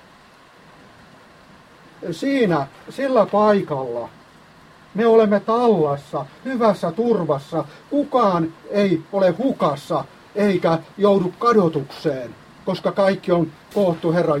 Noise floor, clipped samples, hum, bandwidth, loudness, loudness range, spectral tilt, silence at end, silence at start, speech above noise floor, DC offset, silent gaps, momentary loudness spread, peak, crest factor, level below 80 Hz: -49 dBFS; under 0.1%; none; 13.5 kHz; -20 LUFS; 2 LU; -7.5 dB/octave; 0 s; 2 s; 30 dB; under 0.1%; none; 12 LU; -4 dBFS; 16 dB; -60 dBFS